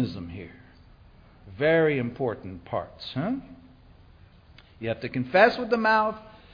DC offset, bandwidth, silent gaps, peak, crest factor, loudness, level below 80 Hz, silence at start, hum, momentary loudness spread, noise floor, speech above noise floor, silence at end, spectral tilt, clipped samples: under 0.1%; 5.2 kHz; none; -4 dBFS; 22 dB; -25 LUFS; -56 dBFS; 0 s; none; 18 LU; -53 dBFS; 28 dB; 0.2 s; -7.5 dB/octave; under 0.1%